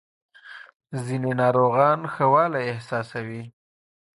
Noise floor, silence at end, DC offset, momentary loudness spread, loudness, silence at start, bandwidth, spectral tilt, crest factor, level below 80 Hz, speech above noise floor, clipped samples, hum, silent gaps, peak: under -90 dBFS; 0.65 s; under 0.1%; 23 LU; -22 LUFS; 0.45 s; 11.5 kHz; -7.5 dB/octave; 20 dB; -66 dBFS; over 68 dB; under 0.1%; none; 0.75-0.80 s; -6 dBFS